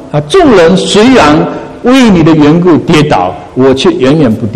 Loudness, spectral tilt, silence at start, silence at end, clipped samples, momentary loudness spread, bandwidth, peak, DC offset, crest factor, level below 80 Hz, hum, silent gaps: -5 LUFS; -6 dB/octave; 0 s; 0 s; 5%; 6 LU; 12.5 kHz; 0 dBFS; 1%; 6 dB; -30 dBFS; none; none